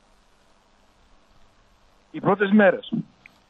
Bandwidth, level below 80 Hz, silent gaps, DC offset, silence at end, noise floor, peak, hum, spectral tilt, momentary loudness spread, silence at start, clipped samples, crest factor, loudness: 4.3 kHz; -64 dBFS; none; under 0.1%; 0.45 s; -59 dBFS; -6 dBFS; none; -8.5 dB/octave; 21 LU; 2.15 s; under 0.1%; 18 dB; -21 LUFS